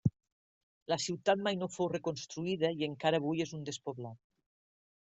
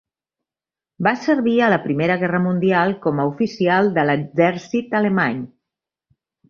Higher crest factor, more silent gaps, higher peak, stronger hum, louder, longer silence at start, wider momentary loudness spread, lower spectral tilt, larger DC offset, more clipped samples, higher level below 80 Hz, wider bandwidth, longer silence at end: about the same, 22 dB vs 18 dB; first, 0.32-0.86 s vs none; second, -14 dBFS vs -2 dBFS; neither; second, -35 LUFS vs -19 LUFS; second, 0.05 s vs 1 s; first, 11 LU vs 5 LU; second, -5 dB/octave vs -7.5 dB/octave; neither; neither; second, -70 dBFS vs -62 dBFS; first, 8.2 kHz vs 7 kHz; about the same, 1 s vs 1 s